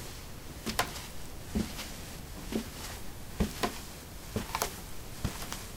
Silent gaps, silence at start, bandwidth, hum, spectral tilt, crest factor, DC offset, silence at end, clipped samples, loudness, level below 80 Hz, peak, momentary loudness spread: none; 0 s; 18 kHz; none; -4 dB/octave; 28 dB; under 0.1%; 0 s; under 0.1%; -38 LUFS; -46 dBFS; -10 dBFS; 11 LU